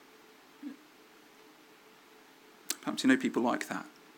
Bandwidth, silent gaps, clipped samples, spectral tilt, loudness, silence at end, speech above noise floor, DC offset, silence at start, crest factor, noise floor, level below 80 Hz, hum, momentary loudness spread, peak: 18 kHz; none; under 0.1%; -3.5 dB/octave; -31 LUFS; 0.3 s; 28 dB; under 0.1%; 0.6 s; 24 dB; -58 dBFS; -90 dBFS; none; 21 LU; -12 dBFS